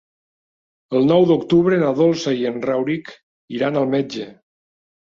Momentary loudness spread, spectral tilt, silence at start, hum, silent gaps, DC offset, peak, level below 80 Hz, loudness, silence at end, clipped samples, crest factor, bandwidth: 13 LU; -7 dB/octave; 0.9 s; none; 3.23-3.48 s; under 0.1%; -4 dBFS; -60 dBFS; -18 LUFS; 0.7 s; under 0.1%; 16 dB; 7.4 kHz